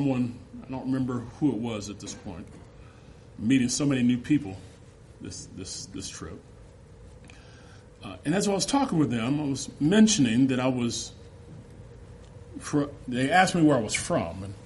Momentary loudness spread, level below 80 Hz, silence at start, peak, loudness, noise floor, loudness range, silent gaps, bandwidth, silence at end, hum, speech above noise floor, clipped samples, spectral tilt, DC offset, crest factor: 23 LU; -54 dBFS; 0 s; -6 dBFS; -26 LUFS; -50 dBFS; 10 LU; none; 11.5 kHz; 0 s; none; 24 dB; under 0.1%; -5 dB/octave; under 0.1%; 22 dB